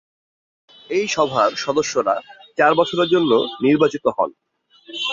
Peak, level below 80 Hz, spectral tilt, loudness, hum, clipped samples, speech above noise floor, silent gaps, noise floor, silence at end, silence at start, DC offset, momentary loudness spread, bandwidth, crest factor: -2 dBFS; -62 dBFS; -4 dB/octave; -19 LUFS; none; under 0.1%; 25 dB; none; -43 dBFS; 0 s; 0.9 s; under 0.1%; 9 LU; 7.6 kHz; 18 dB